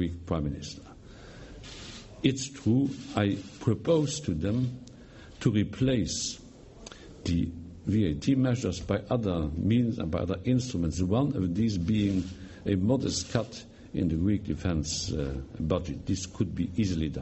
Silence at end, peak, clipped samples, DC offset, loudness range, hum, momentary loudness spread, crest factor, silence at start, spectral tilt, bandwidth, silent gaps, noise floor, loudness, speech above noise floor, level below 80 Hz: 0 s; -8 dBFS; under 0.1%; under 0.1%; 3 LU; none; 18 LU; 20 dB; 0 s; -6 dB/octave; 8.4 kHz; none; -49 dBFS; -29 LUFS; 21 dB; -46 dBFS